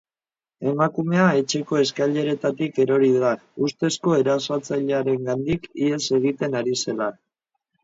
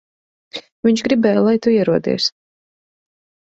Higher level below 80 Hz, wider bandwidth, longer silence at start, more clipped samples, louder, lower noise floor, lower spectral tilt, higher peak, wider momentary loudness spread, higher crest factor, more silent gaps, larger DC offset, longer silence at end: about the same, -60 dBFS vs -58 dBFS; about the same, 7.8 kHz vs 8 kHz; about the same, 0.6 s vs 0.55 s; neither; second, -22 LUFS vs -16 LUFS; about the same, under -90 dBFS vs under -90 dBFS; about the same, -5.5 dB/octave vs -5.5 dB/octave; second, -6 dBFS vs -2 dBFS; second, 7 LU vs 18 LU; about the same, 18 dB vs 16 dB; second, none vs 0.72-0.83 s; neither; second, 0.7 s vs 1.3 s